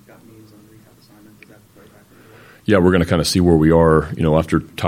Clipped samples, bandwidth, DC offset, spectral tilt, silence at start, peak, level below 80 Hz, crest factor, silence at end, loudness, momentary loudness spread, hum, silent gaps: under 0.1%; 16.5 kHz; under 0.1%; -6.5 dB/octave; 2.7 s; 0 dBFS; -36 dBFS; 18 dB; 0 s; -15 LUFS; 5 LU; none; none